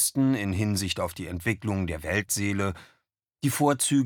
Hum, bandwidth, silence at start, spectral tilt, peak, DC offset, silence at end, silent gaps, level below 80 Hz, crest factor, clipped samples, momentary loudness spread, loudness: none; 19 kHz; 0 s; -4.5 dB/octave; -10 dBFS; under 0.1%; 0 s; none; -50 dBFS; 18 dB; under 0.1%; 8 LU; -27 LUFS